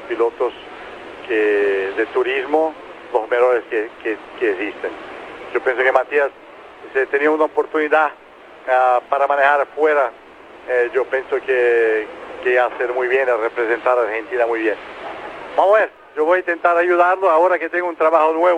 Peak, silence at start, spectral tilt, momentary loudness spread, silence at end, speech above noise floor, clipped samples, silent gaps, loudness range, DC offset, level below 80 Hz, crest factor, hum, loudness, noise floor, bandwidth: 0 dBFS; 0 s; -4.5 dB/octave; 14 LU; 0 s; 22 dB; under 0.1%; none; 4 LU; under 0.1%; -62 dBFS; 18 dB; none; -18 LUFS; -39 dBFS; 9.8 kHz